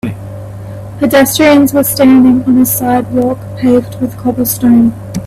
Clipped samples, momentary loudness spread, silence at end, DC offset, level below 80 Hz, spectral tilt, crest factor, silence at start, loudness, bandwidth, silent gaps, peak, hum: under 0.1%; 19 LU; 0 s; under 0.1%; -40 dBFS; -5 dB/octave; 10 dB; 0.05 s; -9 LUFS; 16 kHz; none; 0 dBFS; none